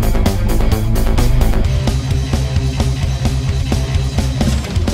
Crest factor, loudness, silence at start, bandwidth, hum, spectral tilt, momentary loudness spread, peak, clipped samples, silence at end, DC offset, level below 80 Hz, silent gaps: 14 dB; -17 LUFS; 0 s; 16.5 kHz; none; -6 dB/octave; 2 LU; 0 dBFS; under 0.1%; 0 s; under 0.1%; -16 dBFS; none